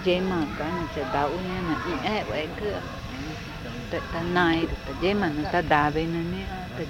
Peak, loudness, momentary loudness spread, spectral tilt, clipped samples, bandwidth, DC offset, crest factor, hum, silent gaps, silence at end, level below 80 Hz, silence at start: -6 dBFS; -27 LUFS; 12 LU; -6.5 dB/octave; under 0.1%; 16 kHz; under 0.1%; 22 dB; none; none; 0 s; -42 dBFS; 0 s